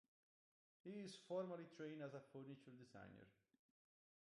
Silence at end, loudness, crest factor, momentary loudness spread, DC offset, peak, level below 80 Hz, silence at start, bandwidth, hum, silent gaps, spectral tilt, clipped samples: 0.9 s; -55 LUFS; 20 dB; 14 LU; under 0.1%; -38 dBFS; under -90 dBFS; 0.85 s; 11 kHz; none; none; -6 dB/octave; under 0.1%